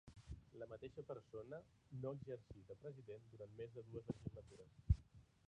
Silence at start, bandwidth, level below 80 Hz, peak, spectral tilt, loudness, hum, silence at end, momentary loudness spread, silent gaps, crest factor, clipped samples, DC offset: 0.05 s; 10 kHz; -56 dBFS; -24 dBFS; -9 dB/octave; -52 LUFS; none; 0.25 s; 16 LU; none; 26 dB; under 0.1%; under 0.1%